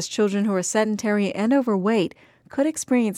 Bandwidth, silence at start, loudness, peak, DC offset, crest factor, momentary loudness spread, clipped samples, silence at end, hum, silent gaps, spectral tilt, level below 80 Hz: 14 kHz; 0 s; -22 LUFS; -10 dBFS; under 0.1%; 12 dB; 4 LU; under 0.1%; 0 s; none; none; -5 dB/octave; -68 dBFS